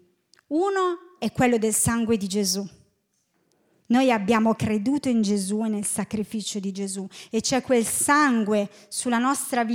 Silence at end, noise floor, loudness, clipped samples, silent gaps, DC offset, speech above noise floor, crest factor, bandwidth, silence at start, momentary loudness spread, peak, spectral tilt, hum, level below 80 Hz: 0 s; -71 dBFS; -23 LUFS; under 0.1%; none; under 0.1%; 48 dB; 18 dB; 17 kHz; 0.5 s; 9 LU; -6 dBFS; -4 dB/octave; none; -58 dBFS